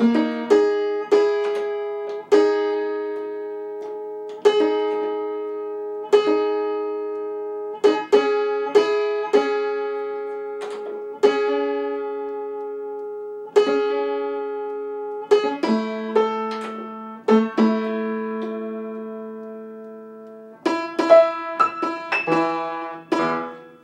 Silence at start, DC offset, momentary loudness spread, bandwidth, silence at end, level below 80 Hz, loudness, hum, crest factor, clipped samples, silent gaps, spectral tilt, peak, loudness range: 0 s; under 0.1%; 13 LU; 9 kHz; 0.05 s; -78 dBFS; -22 LUFS; none; 20 dB; under 0.1%; none; -5.5 dB/octave; -2 dBFS; 4 LU